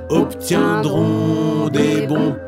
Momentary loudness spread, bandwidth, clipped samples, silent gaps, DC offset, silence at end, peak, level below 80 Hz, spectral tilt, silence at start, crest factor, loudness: 2 LU; 16 kHz; under 0.1%; none; under 0.1%; 0 s; -2 dBFS; -48 dBFS; -6.5 dB/octave; 0 s; 16 dB; -17 LUFS